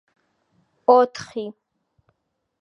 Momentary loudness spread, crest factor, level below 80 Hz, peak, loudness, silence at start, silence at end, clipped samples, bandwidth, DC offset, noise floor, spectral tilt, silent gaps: 17 LU; 22 dB; -72 dBFS; -2 dBFS; -20 LUFS; 0.9 s; 1.1 s; under 0.1%; 8 kHz; under 0.1%; -75 dBFS; -4.5 dB/octave; none